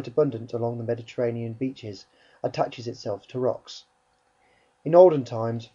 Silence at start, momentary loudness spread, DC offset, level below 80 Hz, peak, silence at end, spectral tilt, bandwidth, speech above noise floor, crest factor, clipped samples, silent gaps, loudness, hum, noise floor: 0 s; 21 LU; under 0.1%; -68 dBFS; -4 dBFS; 0.1 s; -7.5 dB/octave; 7.4 kHz; 42 dB; 22 dB; under 0.1%; none; -25 LUFS; none; -67 dBFS